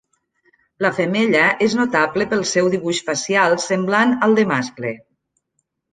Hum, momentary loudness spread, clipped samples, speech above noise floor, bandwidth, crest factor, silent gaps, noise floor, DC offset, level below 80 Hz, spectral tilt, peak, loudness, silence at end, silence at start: none; 7 LU; under 0.1%; 55 dB; 9.6 kHz; 18 dB; none; -72 dBFS; under 0.1%; -62 dBFS; -4 dB/octave; -2 dBFS; -18 LUFS; 0.95 s; 0.8 s